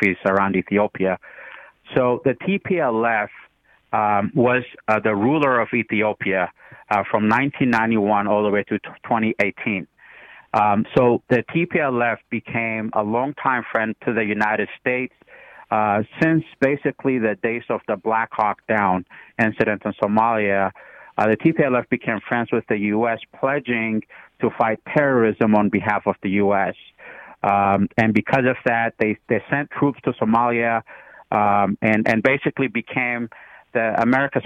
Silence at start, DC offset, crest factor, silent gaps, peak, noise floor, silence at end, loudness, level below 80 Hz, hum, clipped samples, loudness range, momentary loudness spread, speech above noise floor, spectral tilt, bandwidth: 0 s; under 0.1%; 18 dB; none; -4 dBFS; -52 dBFS; 0.05 s; -20 LUFS; -58 dBFS; none; under 0.1%; 2 LU; 7 LU; 32 dB; -8 dB/octave; 7.6 kHz